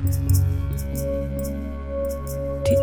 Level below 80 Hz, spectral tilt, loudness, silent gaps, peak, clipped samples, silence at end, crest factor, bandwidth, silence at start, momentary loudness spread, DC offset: -30 dBFS; -7 dB/octave; -25 LUFS; none; -8 dBFS; under 0.1%; 0 s; 14 dB; 19 kHz; 0 s; 8 LU; under 0.1%